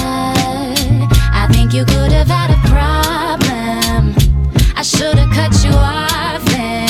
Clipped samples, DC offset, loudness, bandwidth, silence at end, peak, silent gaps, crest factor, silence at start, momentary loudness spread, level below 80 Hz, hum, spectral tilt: under 0.1%; under 0.1%; -13 LUFS; 16 kHz; 0 s; 0 dBFS; none; 12 dB; 0 s; 4 LU; -16 dBFS; none; -5 dB/octave